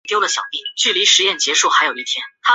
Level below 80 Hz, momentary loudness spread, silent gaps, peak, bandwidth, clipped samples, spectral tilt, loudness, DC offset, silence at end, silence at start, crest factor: -74 dBFS; 10 LU; none; 0 dBFS; 8.4 kHz; under 0.1%; 2 dB/octave; -15 LUFS; under 0.1%; 0 s; 0.05 s; 16 dB